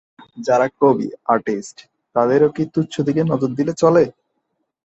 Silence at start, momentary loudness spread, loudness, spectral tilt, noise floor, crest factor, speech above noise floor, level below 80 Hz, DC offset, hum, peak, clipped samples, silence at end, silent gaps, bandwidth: 0.35 s; 10 LU; -18 LUFS; -7 dB/octave; -72 dBFS; 16 dB; 55 dB; -60 dBFS; under 0.1%; none; -2 dBFS; under 0.1%; 0.75 s; none; 8.2 kHz